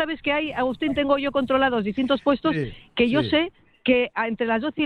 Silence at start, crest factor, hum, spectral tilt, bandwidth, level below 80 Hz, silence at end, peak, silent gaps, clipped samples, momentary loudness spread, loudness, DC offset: 0 s; 16 dB; none; -7 dB/octave; 9 kHz; -50 dBFS; 0 s; -6 dBFS; none; under 0.1%; 5 LU; -23 LUFS; under 0.1%